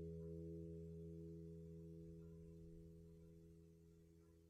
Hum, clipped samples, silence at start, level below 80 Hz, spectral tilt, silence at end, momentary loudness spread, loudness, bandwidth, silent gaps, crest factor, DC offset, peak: 60 Hz at -85 dBFS; under 0.1%; 0 s; -68 dBFS; -10 dB/octave; 0 s; 14 LU; -58 LUFS; 13 kHz; none; 14 dB; under 0.1%; -44 dBFS